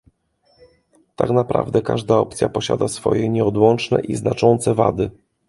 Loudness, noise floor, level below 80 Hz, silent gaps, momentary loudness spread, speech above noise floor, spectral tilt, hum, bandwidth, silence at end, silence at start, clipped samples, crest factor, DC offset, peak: -19 LUFS; -61 dBFS; -48 dBFS; none; 6 LU; 43 dB; -6.5 dB/octave; none; 11.5 kHz; 0.4 s; 1.2 s; under 0.1%; 18 dB; under 0.1%; 0 dBFS